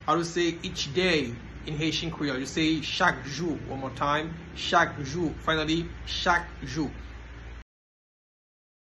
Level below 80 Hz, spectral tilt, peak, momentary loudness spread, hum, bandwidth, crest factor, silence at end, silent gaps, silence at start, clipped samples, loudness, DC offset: -46 dBFS; -4.5 dB/octave; -8 dBFS; 12 LU; none; 12 kHz; 22 dB; 1.35 s; none; 0 s; under 0.1%; -28 LUFS; under 0.1%